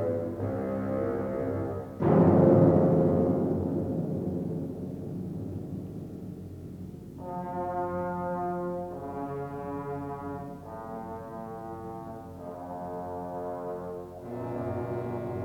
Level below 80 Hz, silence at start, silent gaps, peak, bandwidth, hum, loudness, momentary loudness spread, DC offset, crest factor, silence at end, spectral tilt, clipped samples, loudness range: -58 dBFS; 0 s; none; -10 dBFS; 8.6 kHz; none; -30 LUFS; 18 LU; under 0.1%; 20 dB; 0 s; -10.5 dB/octave; under 0.1%; 14 LU